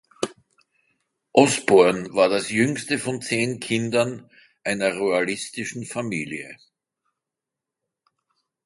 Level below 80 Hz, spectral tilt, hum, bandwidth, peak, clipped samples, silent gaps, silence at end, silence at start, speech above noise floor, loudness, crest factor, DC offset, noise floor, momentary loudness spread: -64 dBFS; -4.5 dB/octave; none; 11.5 kHz; 0 dBFS; under 0.1%; none; 2.1 s; 0.2 s; 65 dB; -22 LUFS; 24 dB; under 0.1%; -86 dBFS; 15 LU